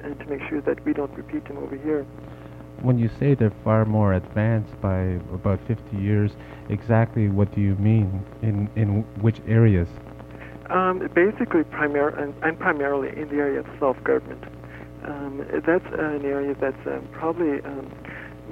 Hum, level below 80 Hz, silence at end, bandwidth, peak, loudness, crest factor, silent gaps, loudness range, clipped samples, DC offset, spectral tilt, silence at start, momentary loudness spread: none; -48 dBFS; 0 s; 4.5 kHz; -6 dBFS; -24 LUFS; 18 dB; none; 4 LU; under 0.1%; under 0.1%; -10 dB/octave; 0 s; 17 LU